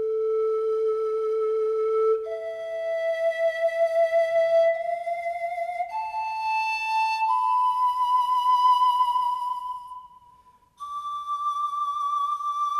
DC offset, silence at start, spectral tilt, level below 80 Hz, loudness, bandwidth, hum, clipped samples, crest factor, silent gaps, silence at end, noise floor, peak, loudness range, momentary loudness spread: under 0.1%; 0 s; -1 dB/octave; -70 dBFS; -24 LUFS; 14 kHz; none; under 0.1%; 12 dB; none; 0 s; -57 dBFS; -12 dBFS; 5 LU; 11 LU